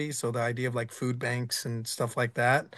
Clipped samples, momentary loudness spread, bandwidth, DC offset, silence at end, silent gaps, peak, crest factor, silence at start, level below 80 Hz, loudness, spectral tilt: under 0.1%; 6 LU; 12.5 kHz; under 0.1%; 0 s; none; -12 dBFS; 18 dB; 0 s; -72 dBFS; -30 LUFS; -4.5 dB/octave